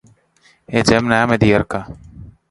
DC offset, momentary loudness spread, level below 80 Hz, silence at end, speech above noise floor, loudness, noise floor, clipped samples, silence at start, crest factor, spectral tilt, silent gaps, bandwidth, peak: under 0.1%; 18 LU; -40 dBFS; 0.2 s; 40 dB; -16 LUFS; -55 dBFS; under 0.1%; 0.7 s; 18 dB; -5.5 dB/octave; none; 11.5 kHz; 0 dBFS